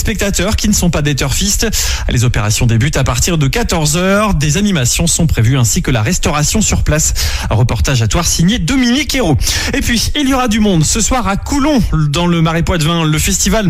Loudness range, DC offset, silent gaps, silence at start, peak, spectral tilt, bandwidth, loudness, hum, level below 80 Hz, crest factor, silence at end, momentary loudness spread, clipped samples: 1 LU; under 0.1%; none; 0 s; -2 dBFS; -4 dB/octave; 16 kHz; -12 LUFS; none; -20 dBFS; 10 dB; 0 s; 3 LU; under 0.1%